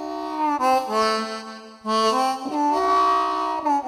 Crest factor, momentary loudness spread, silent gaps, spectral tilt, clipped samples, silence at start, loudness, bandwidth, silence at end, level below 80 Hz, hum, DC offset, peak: 14 dB; 11 LU; none; -3 dB/octave; under 0.1%; 0 s; -22 LUFS; 16 kHz; 0 s; -60 dBFS; none; under 0.1%; -8 dBFS